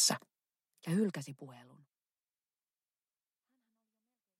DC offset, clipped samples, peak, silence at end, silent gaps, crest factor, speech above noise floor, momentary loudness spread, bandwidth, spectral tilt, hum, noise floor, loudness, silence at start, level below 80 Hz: under 0.1%; under 0.1%; -16 dBFS; 2.75 s; none; 26 dB; over 53 dB; 19 LU; 16 kHz; -3 dB/octave; none; under -90 dBFS; -35 LUFS; 0 s; under -90 dBFS